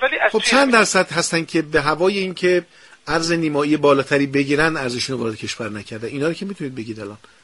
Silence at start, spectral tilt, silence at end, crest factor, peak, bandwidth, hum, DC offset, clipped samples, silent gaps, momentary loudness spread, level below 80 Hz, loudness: 0 s; -4 dB/octave; 0.25 s; 20 dB; 0 dBFS; 11.5 kHz; none; under 0.1%; under 0.1%; none; 14 LU; -50 dBFS; -18 LUFS